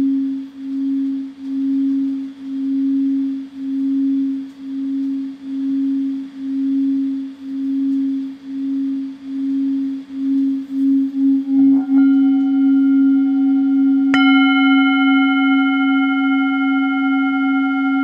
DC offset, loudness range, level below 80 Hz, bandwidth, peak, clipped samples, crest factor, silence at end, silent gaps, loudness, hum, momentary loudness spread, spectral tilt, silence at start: under 0.1%; 8 LU; -68 dBFS; 5 kHz; -2 dBFS; under 0.1%; 16 dB; 0 s; none; -17 LUFS; none; 12 LU; -5.5 dB/octave; 0 s